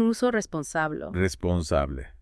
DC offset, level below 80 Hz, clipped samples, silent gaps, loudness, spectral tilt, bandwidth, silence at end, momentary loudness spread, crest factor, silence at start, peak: under 0.1%; -42 dBFS; under 0.1%; none; -27 LUFS; -5.5 dB/octave; 12 kHz; 0.05 s; 4 LU; 16 dB; 0 s; -10 dBFS